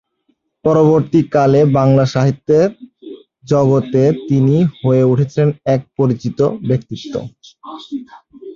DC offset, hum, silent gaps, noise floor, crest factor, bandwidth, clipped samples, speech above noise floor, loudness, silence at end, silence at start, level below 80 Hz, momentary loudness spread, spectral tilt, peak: under 0.1%; none; none; -64 dBFS; 14 dB; 7.2 kHz; under 0.1%; 50 dB; -14 LUFS; 0 s; 0.65 s; -50 dBFS; 16 LU; -8.5 dB/octave; -2 dBFS